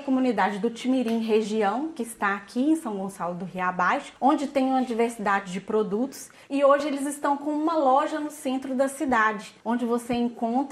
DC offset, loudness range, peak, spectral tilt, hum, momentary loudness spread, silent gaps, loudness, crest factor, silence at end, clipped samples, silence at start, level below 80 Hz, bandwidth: under 0.1%; 2 LU; -8 dBFS; -5 dB/octave; none; 8 LU; none; -25 LUFS; 18 dB; 0 s; under 0.1%; 0 s; -66 dBFS; 14.5 kHz